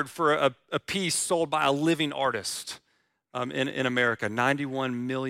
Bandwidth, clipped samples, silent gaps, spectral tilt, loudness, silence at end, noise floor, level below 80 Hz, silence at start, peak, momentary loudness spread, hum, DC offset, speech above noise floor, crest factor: 16 kHz; under 0.1%; none; -3.5 dB/octave; -27 LUFS; 0 s; -72 dBFS; -68 dBFS; 0 s; -10 dBFS; 10 LU; none; under 0.1%; 45 dB; 18 dB